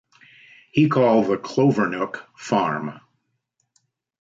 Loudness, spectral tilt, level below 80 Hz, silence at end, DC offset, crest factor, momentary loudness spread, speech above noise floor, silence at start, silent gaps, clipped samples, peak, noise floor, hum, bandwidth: -21 LUFS; -7 dB/octave; -64 dBFS; 1.25 s; under 0.1%; 16 dB; 12 LU; 53 dB; 0.75 s; none; under 0.1%; -6 dBFS; -74 dBFS; none; 7.8 kHz